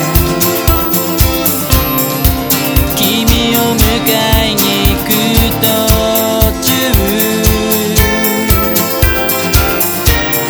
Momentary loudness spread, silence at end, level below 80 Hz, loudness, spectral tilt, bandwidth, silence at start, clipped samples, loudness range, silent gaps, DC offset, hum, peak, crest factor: 2 LU; 0 s; -18 dBFS; -10 LUFS; -4 dB/octave; over 20 kHz; 0 s; 0.3%; 1 LU; none; under 0.1%; none; 0 dBFS; 10 dB